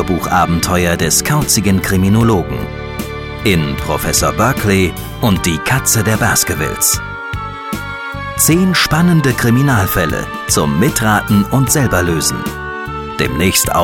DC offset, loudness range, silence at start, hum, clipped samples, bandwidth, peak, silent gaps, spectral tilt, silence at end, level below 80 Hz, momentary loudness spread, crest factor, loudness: under 0.1%; 2 LU; 0 s; none; under 0.1%; 17 kHz; 0 dBFS; none; -4 dB/octave; 0 s; -30 dBFS; 11 LU; 12 dB; -13 LUFS